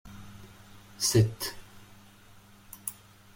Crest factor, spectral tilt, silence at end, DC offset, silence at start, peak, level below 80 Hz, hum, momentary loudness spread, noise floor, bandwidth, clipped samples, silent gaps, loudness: 22 dB; -4.5 dB/octave; 0.45 s; under 0.1%; 0.05 s; -12 dBFS; -56 dBFS; none; 28 LU; -55 dBFS; 16.5 kHz; under 0.1%; none; -29 LUFS